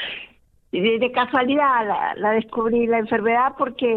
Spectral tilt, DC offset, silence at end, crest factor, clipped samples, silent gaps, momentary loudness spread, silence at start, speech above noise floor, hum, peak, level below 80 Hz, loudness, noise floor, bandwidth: -7.5 dB/octave; under 0.1%; 0 s; 14 dB; under 0.1%; none; 5 LU; 0 s; 30 dB; none; -8 dBFS; -58 dBFS; -20 LUFS; -50 dBFS; 4.3 kHz